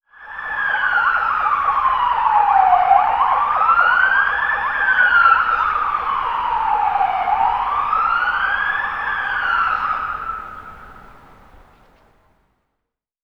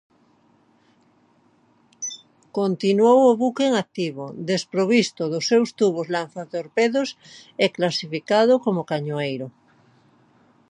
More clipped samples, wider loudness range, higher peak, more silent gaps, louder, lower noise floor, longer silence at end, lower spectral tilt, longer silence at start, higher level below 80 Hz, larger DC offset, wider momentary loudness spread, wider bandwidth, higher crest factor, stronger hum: neither; first, 9 LU vs 4 LU; about the same, -2 dBFS vs -4 dBFS; neither; first, -16 LUFS vs -22 LUFS; first, -79 dBFS vs -60 dBFS; first, 2.25 s vs 1.25 s; second, -3.5 dB/octave vs -5 dB/octave; second, 0.2 s vs 2 s; first, -46 dBFS vs -74 dBFS; neither; second, 9 LU vs 14 LU; second, 6.4 kHz vs 10.5 kHz; about the same, 18 dB vs 18 dB; neither